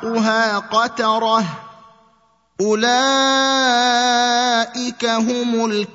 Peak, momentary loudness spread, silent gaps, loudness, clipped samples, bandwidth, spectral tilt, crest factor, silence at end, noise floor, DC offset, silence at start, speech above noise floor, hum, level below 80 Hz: -2 dBFS; 6 LU; none; -17 LUFS; under 0.1%; 8 kHz; -2.5 dB/octave; 14 dB; 0.1 s; -58 dBFS; under 0.1%; 0 s; 41 dB; none; -68 dBFS